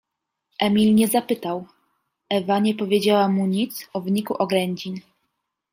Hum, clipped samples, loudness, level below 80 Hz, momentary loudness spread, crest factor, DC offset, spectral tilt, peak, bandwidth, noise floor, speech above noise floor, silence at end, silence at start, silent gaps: none; under 0.1%; -21 LUFS; -64 dBFS; 13 LU; 18 dB; under 0.1%; -5.5 dB/octave; -6 dBFS; 16 kHz; -79 dBFS; 58 dB; 0.75 s; 0.6 s; none